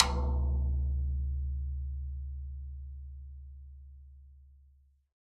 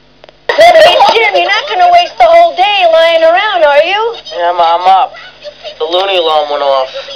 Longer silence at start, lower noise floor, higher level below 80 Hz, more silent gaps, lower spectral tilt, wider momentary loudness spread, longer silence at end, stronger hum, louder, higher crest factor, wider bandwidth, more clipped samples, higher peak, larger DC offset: second, 0 s vs 0.5 s; first, -64 dBFS vs -27 dBFS; first, -36 dBFS vs -46 dBFS; neither; first, -6 dB/octave vs -2 dB/octave; first, 21 LU vs 11 LU; first, 0.65 s vs 0 s; neither; second, -35 LUFS vs -7 LUFS; first, 34 dB vs 8 dB; first, 8 kHz vs 5.4 kHz; second, under 0.1% vs 3%; about the same, -2 dBFS vs 0 dBFS; second, under 0.1% vs 0.4%